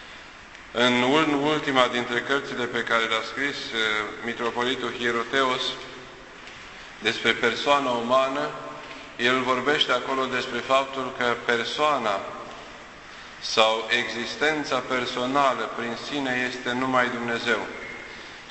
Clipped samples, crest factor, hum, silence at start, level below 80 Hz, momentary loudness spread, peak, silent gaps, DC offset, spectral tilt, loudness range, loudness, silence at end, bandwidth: under 0.1%; 24 dB; none; 0 s; -58 dBFS; 18 LU; -2 dBFS; none; under 0.1%; -3.5 dB/octave; 3 LU; -24 LUFS; 0 s; 8.4 kHz